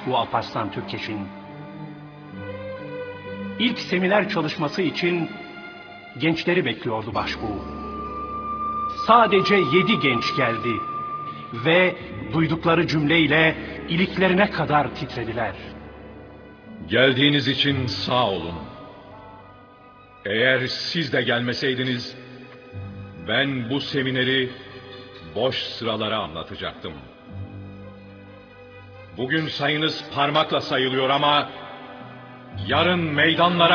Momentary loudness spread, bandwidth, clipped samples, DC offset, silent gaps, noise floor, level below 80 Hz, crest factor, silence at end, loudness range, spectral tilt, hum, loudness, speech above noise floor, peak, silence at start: 22 LU; 5.4 kHz; under 0.1%; under 0.1%; none; -48 dBFS; -50 dBFS; 22 dB; 0 s; 9 LU; -6 dB/octave; none; -22 LUFS; 26 dB; -2 dBFS; 0 s